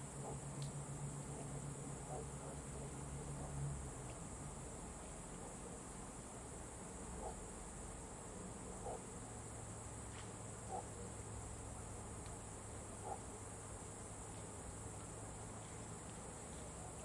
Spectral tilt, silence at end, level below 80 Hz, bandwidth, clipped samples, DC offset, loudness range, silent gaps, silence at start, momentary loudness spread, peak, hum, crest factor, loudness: -4.5 dB/octave; 0 s; -58 dBFS; 11.5 kHz; under 0.1%; under 0.1%; 2 LU; none; 0 s; 3 LU; -32 dBFS; none; 16 dB; -50 LUFS